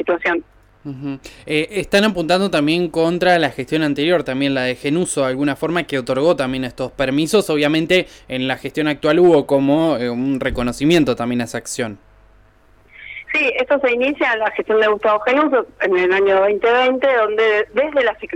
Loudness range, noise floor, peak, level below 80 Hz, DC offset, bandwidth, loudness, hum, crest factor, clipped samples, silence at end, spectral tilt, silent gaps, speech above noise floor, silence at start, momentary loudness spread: 4 LU; -51 dBFS; -4 dBFS; -46 dBFS; under 0.1%; 17 kHz; -17 LUFS; 50 Hz at -55 dBFS; 14 dB; under 0.1%; 0 s; -5 dB/octave; none; 34 dB; 0 s; 9 LU